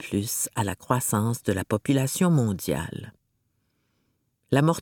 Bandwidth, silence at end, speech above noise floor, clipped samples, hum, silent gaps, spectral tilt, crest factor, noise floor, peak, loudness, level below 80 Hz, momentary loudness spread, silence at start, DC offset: 19 kHz; 0 s; 48 dB; under 0.1%; none; none; -5.5 dB/octave; 22 dB; -73 dBFS; -6 dBFS; -25 LUFS; -56 dBFS; 7 LU; 0 s; under 0.1%